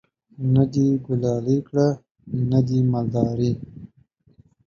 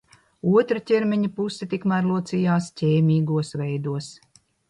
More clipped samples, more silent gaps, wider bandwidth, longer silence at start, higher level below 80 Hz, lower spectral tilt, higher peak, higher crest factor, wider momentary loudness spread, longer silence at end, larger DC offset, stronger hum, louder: neither; first, 2.11-2.15 s vs none; second, 7 kHz vs 11 kHz; about the same, 0.4 s vs 0.45 s; first, -52 dBFS vs -64 dBFS; first, -9.5 dB/octave vs -7.5 dB/octave; about the same, -4 dBFS vs -6 dBFS; about the same, 18 dB vs 16 dB; about the same, 11 LU vs 9 LU; first, 0.8 s vs 0.55 s; neither; neither; about the same, -22 LUFS vs -23 LUFS